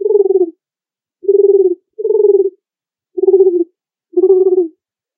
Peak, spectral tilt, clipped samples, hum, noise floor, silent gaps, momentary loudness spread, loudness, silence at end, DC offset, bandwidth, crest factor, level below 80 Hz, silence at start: 0 dBFS; -13.5 dB/octave; under 0.1%; none; under -90 dBFS; none; 11 LU; -13 LUFS; 0.5 s; under 0.1%; 1.2 kHz; 14 dB; -84 dBFS; 0 s